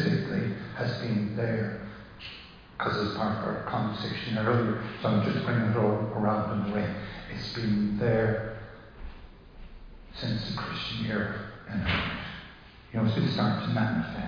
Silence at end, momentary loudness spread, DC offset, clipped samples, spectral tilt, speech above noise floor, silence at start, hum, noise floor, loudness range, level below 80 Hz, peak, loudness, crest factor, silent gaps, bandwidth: 0 s; 16 LU; under 0.1%; under 0.1%; -8 dB/octave; 21 dB; 0 s; none; -49 dBFS; 5 LU; -50 dBFS; -12 dBFS; -30 LUFS; 16 dB; none; 5.2 kHz